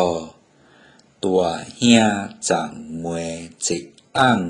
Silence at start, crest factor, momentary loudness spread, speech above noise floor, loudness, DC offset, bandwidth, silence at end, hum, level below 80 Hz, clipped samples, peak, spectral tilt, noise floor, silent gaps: 0 s; 20 dB; 15 LU; 33 dB; -21 LUFS; under 0.1%; 11 kHz; 0 s; none; -54 dBFS; under 0.1%; 0 dBFS; -4 dB/octave; -53 dBFS; none